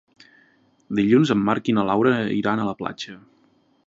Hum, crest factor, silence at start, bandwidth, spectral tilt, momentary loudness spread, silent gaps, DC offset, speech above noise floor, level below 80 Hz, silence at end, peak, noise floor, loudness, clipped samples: none; 18 dB; 0.9 s; 7.8 kHz; -7 dB/octave; 13 LU; none; under 0.1%; 40 dB; -60 dBFS; 0.7 s; -4 dBFS; -61 dBFS; -21 LUFS; under 0.1%